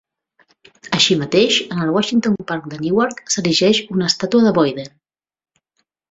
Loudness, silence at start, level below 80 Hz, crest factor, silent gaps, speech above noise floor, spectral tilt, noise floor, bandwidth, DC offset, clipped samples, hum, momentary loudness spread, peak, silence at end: -16 LUFS; 0.85 s; -58 dBFS; 18 dB; none; 54 dB; -4 dB/octave; -71 dBFS; 8 kHz; under 0.1%; under 0.1%; none; 9 LU; -2 dBFS; 1.25 s